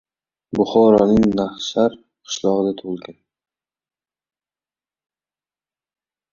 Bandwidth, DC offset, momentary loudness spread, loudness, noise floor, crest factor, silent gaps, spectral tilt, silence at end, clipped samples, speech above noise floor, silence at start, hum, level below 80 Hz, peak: 7.6 kHz; under 0.1%; 16 LU; -18 LUFS; under -90 dBFS; 20 dB; none; -6 dB/octave; 3.2 s; under 0.1%; over 73 dB; 0.55 s; none; -50 dBFS; -2 dBFS